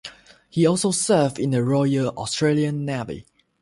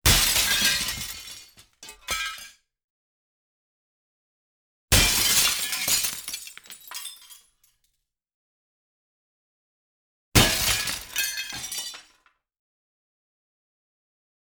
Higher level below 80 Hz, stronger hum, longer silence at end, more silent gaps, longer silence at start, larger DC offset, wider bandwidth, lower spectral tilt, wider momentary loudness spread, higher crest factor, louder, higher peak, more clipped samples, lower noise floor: second, -56 dBFS vs -40 dBFS; neither; second, 0.4 s vs 2.55 s; second, none vs 2.84-4.88 s, 8.34-10.32 s; about the same, 0.05 s vs 0.05 s; neither; second, 11.5 kHz vs over 20 kHz; first, -5.5 dB/octave vs -1.5 dB/octave; second, 11 LU vs 21 LU; second, 16 dB vs 24 dB; about the same, -21 LUFS vs -22 LUFS; about the same, -6 dBFS vs -4 dBFS; neither; second, -44 dBFS vs -77 dBFS